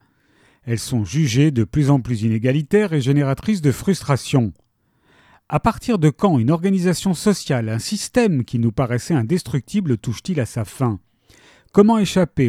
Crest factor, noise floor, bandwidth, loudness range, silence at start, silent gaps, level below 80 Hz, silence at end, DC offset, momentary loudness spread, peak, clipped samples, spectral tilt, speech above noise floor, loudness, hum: 18 dB; -62 dBFS; 15 kHz; 3 LU; 0.65 s; none; -46 dBFS; 0 s; under 0.1%; 7 LU; 0 dBFS; under 0.1%; -6.5 dB/octave; 44 dB; -19 LUFS; none